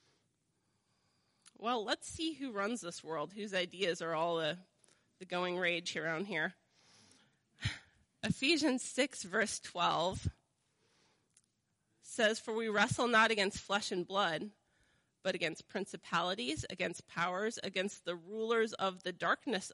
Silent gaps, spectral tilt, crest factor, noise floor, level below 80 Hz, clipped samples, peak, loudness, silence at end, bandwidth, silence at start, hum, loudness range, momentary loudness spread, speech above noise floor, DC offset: none; -3.5 dB/octave; 20 dB; -81 dBFS; -66 dBFS; under 0.1%; -18 dBFS; -36 LUFS; 0 s; 11.5 kHz; 1.6 s; none; 6 LU; 11 LU; 45 dB; under 0.1%